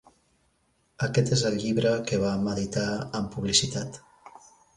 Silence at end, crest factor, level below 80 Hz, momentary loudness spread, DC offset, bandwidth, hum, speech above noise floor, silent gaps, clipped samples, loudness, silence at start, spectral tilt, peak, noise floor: 0.5 s; 22 dB; -54 dBFS; 9 LU; under 0.1%; 11.5 kHz; none; 43 dB; none; under 0.1%; -26 LUFS; 1 s; -4.5 dB/octave; -6 dBFS; -69 dBFS